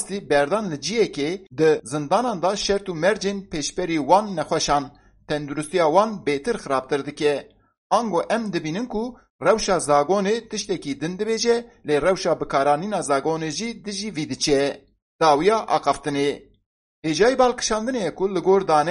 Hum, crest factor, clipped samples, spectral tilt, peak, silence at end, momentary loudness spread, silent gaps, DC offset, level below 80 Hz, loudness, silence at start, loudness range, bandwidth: none; 20 dB; under 0.1%; -4 dB/octave; -2 dBFS; 0 s; 9 LU; 7.78-7.90 s, 9.30-9.39 s, 15.02-15.19 s, 16.66-17.02 s; under 0.1%; -50 dBFS; -22 LUFS; 0 s; 2 LU; 11.5 kHz